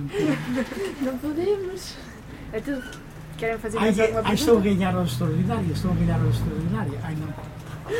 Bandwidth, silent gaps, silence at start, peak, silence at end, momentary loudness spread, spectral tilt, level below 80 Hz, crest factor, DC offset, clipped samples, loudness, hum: 16.5 kHz; none; 0 s; -6 dBFS; 0 s; 17 LU; -6.5 dB/octave; -42 dBFS; 18 dB; under 0.1%; under 0.1%; -25 LUFS; none